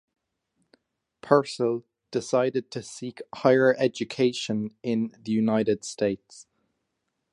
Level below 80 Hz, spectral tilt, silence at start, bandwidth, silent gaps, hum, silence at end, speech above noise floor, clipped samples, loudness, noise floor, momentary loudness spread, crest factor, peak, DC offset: -68 dBFS; -5.5 dB/octave; 1.25 s; 11 kHz; none; none; 0.9 s; 54 dB; under 0.1%; -25 LUFS; -79 dBFS; 14 LU; 24 dB; -4 dBFS; under 0.1%